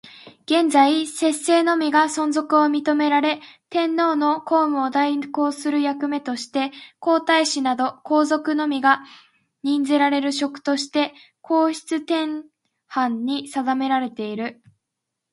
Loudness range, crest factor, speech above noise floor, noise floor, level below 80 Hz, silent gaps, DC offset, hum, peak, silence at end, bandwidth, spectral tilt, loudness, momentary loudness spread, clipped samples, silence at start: 5 LU; 18 dB; 61 dB; -81 dBFS; -76 dBFS; none; under 0.1%; none; -2 dBFS; 0.8 s; 11.5 kHz; -2.5 dB/octave; -21 LUFS; 9 LU; under 0.1%; 0.05 s